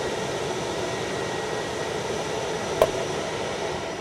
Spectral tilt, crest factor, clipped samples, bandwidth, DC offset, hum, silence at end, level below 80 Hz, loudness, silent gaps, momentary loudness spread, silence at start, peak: -3.5 dB/octave; 24 dB; under 0.1%; 16 kHz; under 0.1%; none; 0 s; -50 dBFS; -27 LUFS; none; 5 LU; 0 s; -4 dBFS